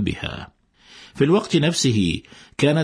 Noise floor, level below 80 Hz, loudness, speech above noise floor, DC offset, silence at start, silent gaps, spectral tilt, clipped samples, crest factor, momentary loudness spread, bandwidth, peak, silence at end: -48 dBFS; -46 dBFS; -21 LUFS; 28 dB; under 0.1%; 0 s; none; -5 dB/octave; under 0.1%; 16 dB; 18 LU; 10.5 kHz; -4 dBFS; 0 s